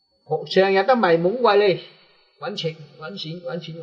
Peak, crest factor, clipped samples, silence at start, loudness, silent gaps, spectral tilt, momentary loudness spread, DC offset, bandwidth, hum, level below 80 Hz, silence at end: -4 dBFS; 18 dB; under 0.1%; 0.3 s; -20 LUFS; none; -6.5 dB/octave; 15 LU; under 0.1%; 7.2 kHz; none; -72 dBFS; 0 s